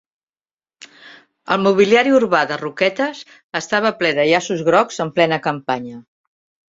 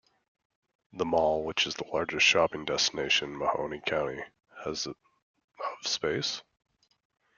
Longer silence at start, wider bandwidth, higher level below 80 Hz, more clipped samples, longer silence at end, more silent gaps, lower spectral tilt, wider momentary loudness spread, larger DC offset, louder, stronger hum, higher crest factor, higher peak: about the same, 1.05 s vs 0.95 s; about the same, 7.8 kHz vs 7.4 kHz; about the same, -62 dBFS vs -64 dBFS; neither; second, 0.7 s vs 0.95 s; second, 3.44-3.49 s vs 5.23-5.34 s, 5.44-5.48 s; first, -4.5 dB/octave vs -2 dB/octave; second, 11 LU vs 15 LU; neither; first, -17 LUFS vs -29 LUFS; neither; about the same, 18 dB vs 22 dB; first, 0 dBFS vs -10 dBFS